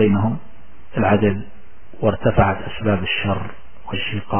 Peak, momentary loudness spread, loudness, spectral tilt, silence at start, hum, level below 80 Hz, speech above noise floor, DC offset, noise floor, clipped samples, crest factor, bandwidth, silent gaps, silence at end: 0 dBFS; 13 LU; -20 LUFS; -11 dB/octave; 0 s; none; -36 dBFS; 27 dB; 4%; -46 dBFS; under 0.1%; 20 dB; 3.3 kHz; none; 0 s